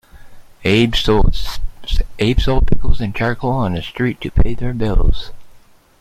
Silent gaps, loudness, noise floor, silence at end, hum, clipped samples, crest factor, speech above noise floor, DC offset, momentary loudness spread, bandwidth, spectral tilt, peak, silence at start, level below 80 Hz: none; -19 LUFS; -44 dBFS; 0.45 s; none; under 0.1%; 14 dB; 31 dB; under 0.1%; 11 LU; 13 kHz; -6.5 dB/octave; 0 dBFS; 0.2 s; -20 dBFS